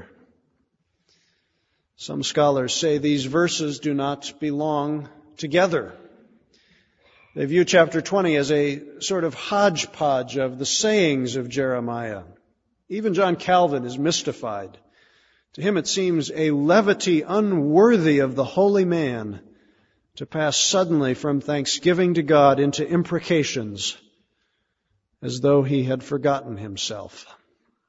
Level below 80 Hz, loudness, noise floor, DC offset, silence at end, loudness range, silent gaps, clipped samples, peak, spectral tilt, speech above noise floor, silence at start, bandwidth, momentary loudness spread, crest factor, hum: -62 dBFS; -21 LUFS; -73 dBFS; under 0.1%; 0.65 s; 6 LU; none; under 0.1%; -2 dBFS; -4.5 dB/octave; 52 dB; 0 s; 8 kHz; 14 LU; 20 dB; none